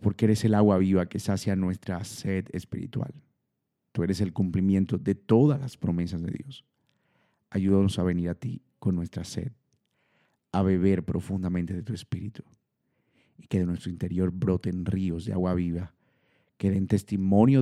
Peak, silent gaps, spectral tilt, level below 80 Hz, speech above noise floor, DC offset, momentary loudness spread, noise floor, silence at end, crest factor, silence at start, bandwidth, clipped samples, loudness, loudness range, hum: -6 dBFS; none; -8 dB/octave; -54 dBFS; 54 dB; under 0.1%; 14 LU; -80 dBFS; 0 s; 20 dB; 0 s; 12.5 kHz; under 0.1%; -27 LUFS; 5 LU; none